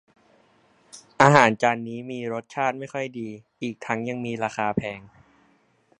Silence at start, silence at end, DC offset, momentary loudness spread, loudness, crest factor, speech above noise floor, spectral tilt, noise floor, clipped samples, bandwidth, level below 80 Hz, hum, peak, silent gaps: 0.95 s; 0.9 s; under 0.1%; 17 LU; -24 LUFS; 26 dB; 39 dB; -5.5 dB/octave; -63 dBFS; under 0.1%; 11 kHz; -62 dBFS; none; 0 dBFS; none